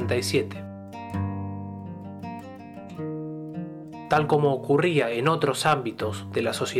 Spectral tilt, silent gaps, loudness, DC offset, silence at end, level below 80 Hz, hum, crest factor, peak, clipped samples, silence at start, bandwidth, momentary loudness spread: -5.5 dB/octave; none; -26 LUFS; under 0.1%; 0 s; -62 dBFS; none; 18 dB; -10 dBFS; under 0.1%; 0 s; 15.5 kHz; 16 LU